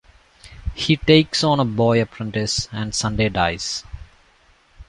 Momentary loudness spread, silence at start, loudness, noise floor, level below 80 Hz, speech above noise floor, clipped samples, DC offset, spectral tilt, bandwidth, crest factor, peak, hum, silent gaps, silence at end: 13 LU; 0.45 s; -19 LUFS; -56 dBFS; -38 dBFS; 36 dB; under 0.1%; under 0.1%; -4.5 dB/octave; 11.5 kHz; 18 dB; -2 dBFS; none; none; 0.05 s